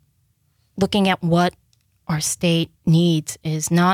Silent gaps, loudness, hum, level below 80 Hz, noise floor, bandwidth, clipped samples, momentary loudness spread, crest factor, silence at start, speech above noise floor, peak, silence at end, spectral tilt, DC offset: none; -20 LUFS; none; -54 dBFS; -64 dBFS; 15.5 kHz; under 0.1%; 9 LU; 14 dB; 0.75 s; 46 dB; -6 dBFS; 0 s; -5 dB/octave; under 0.1%